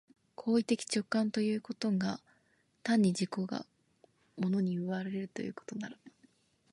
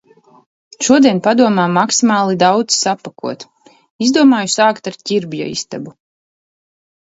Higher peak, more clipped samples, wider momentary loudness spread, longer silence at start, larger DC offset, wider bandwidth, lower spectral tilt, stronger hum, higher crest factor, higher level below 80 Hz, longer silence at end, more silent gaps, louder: second, -18 dBFS vs 0 dBFS; neither; about the same, 13 LU vs 15 LU; second, 0.4 s vs 0.8 s; neither; first, 11.5 kHz vs 8 kHz; first, -5.5 dB/octave vs -4 dB/octave; neither; about the same, 16 dB vs 16 dB; second, -76 dBFS vs -60 dBFS; second, 0.65 s vs 1.15 s; second, none vs 3.90-3.99 s; second, -34 LUFS vs -13 LUFS